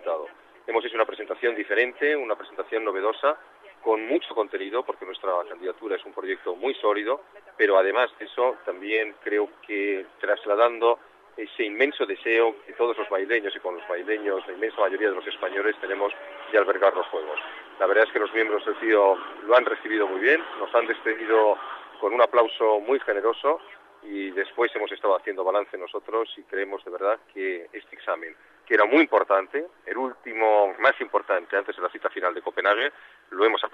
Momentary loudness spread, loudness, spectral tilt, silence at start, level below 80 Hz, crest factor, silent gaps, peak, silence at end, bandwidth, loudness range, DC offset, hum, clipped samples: 11 LU; -25 LUFS; -4 dB/octave; 0 s; -78 dBFS; 18 dB; none; -8 dBFS; 0.05 s; 5.4 kHz; 5 LU; under 0.1%; none; under 0.1%